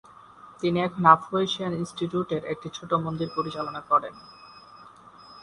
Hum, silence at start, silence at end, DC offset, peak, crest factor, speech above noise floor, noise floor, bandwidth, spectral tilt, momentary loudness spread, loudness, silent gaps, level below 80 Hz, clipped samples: none; 0.45 s; 0 s; under 0.1%; -2 dBFS; 24 dB; 24 dB; -49 dBFS; 11 kHz; -6 dB/octave; 15 LU; -25 LUFS; none; -62 dBFS; under 0.1%